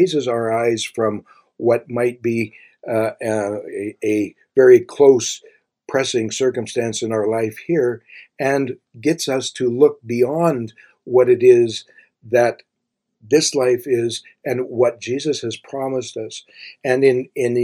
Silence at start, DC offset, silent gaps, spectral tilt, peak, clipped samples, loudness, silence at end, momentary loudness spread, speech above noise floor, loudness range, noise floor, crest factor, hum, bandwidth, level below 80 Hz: 0 s; under 0.1%; none; -5 dB/octave; 0 dBFS; under 0.1%; -18 LUFS; 0 s; 14 LU; 59 dB; 5 LU; -77 dBFS; 18 dB; none; 15 kHz; -66 dBFS